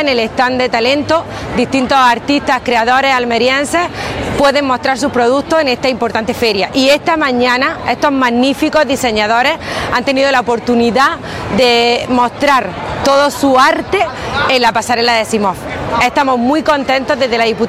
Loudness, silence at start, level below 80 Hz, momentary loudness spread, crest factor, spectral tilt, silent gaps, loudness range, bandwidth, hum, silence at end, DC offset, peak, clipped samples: -12 LUFS; 0 s; -40 dBFS; 5 LU; 12 dB; -4 dB/octave; none; 1 LU; 16 kHz; none; 0 s; under 0.1%; 0 dBFS; under 0.1%